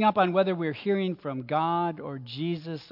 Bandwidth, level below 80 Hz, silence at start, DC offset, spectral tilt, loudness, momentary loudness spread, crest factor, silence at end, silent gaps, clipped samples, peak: 5.8 kHz; -74 dBFS; 0 s; under 0.1%; -9 dB/octave; -28 LUFS; 11 LU; 18 dB; 0.05 s; none; under 0.1%; -10 dBFS